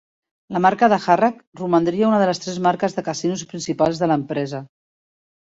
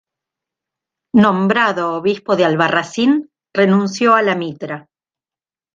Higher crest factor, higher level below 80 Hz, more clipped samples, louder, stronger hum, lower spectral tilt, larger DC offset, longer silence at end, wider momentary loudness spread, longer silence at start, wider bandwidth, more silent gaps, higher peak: about the same, 18 dB vs 16 dB; about the same, -62 dBFS vs -60 dBFS; neither; second, -20 LUFS vs -15 LUFS; neither; about the same, -5.5 dB/octave vs -6 dB/octave; neither; second, 0.75 s vs 0.95 s; about the same, 11 LU vs 11 LU; second, 0.5 s vs 1.15 s; about the same, 8 kHz vs 7.6 kHz; first, 1.47-1.52 s vs none; about the same, -2 dBFS vs -2 dBFS